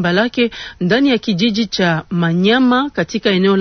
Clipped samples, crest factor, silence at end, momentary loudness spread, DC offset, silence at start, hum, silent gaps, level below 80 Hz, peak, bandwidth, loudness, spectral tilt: under 0.1%; 14 dB; 0 s; 5 LU; under 0.1%; 0 s; none; none; -48 dBFS; -2 dBFS; 6.6 kHz; -15 LUFS; -6 dB/octave